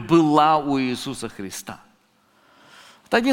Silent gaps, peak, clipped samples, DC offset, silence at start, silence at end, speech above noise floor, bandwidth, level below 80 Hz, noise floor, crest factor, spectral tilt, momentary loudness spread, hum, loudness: none; -2 dBFS; under 0.1%; under 0.1%; 0 s; 0 s; 40 dB; 17 kHz; -56 dBFS; -61 dBFS; 20 dB; -5 dB/octave; 18 LU; none; -21 LUFS